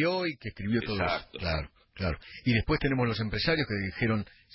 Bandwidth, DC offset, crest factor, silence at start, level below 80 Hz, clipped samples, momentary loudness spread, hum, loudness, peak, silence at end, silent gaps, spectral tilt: 5.8 kHz; under 0.1%; 16 dB; 0 s; -44 dBFS; under 0.1%; 7 LU; none; -30 LUFS; -14 dBFS; 0.3 s; none; -10 dB/octave